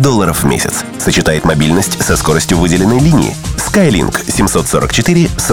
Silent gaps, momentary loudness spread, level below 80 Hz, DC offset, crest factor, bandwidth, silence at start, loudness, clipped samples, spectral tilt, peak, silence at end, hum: none; 4 LU; -26 dBFS; 1%; 10 dB; 18 kHz; 0 s; -11 LUFS; under 0.1%; -4.5 dB/octave; 0 dBFS; 0 s; none